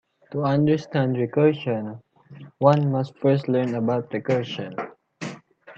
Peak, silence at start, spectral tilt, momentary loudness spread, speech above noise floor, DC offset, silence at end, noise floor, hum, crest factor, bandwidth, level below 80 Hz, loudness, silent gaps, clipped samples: -4 dBFS; 0.3 s; -8 dB/octave; 16 LU; 24 dB; under 0.1%; 0.05 s; -45 dBFS; none; 20 dB; 7.6 kHz; -66 dBFS; -23 LUFS; none; under 0.1%